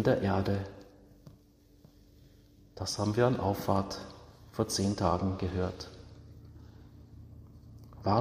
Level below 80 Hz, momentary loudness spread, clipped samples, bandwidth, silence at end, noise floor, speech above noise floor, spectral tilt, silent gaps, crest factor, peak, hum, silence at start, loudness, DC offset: -56 dBFS; 25 LU; under 0.1%; 15.5 kHz; 0 s; -61 dBFS; 31 dB; -6 dB/octave; none; 22 dB; -12 dBFS; none; 0 s; -32 LUFS; under 0.1%